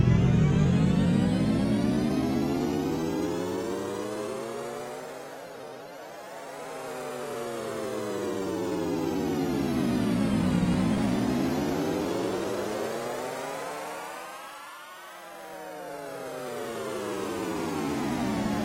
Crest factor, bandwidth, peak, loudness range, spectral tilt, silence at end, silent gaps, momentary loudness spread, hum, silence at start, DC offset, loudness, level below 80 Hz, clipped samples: 18 dB; 16 kHz; -10 dBFS; 11 LU; -6.5 dB/octave; 0 s; none; 17 LU; none; 0 s; under 0.1%; -29 LUFS; -46 dBFS; under 0.1%